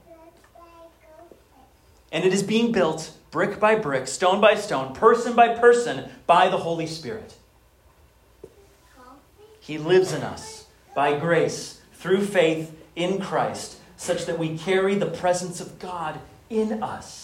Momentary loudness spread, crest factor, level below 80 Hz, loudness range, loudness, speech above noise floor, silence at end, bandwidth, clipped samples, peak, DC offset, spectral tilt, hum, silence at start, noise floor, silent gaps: 17 LU; 20 dB; -60 dBFS; 9 LU; -22 LUFS; 35 dB; 0 s; 15.5 kHz; under 0.1%; -4 dBFS; under 0.1%; -4.5 dB/octave; none; 0.1 s; -57 dBFS; none